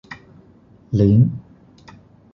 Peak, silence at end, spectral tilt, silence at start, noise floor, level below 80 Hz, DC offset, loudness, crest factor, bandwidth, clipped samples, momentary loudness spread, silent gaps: -4 dBFS; 0.95 s; -10.5 dB/octave; 0.1 s; -50 dBFS; -44 dBFS; under 0.1%; -17 LUFS; 16 dB; 6.2 kHz; under 0.1%; 25 LU; none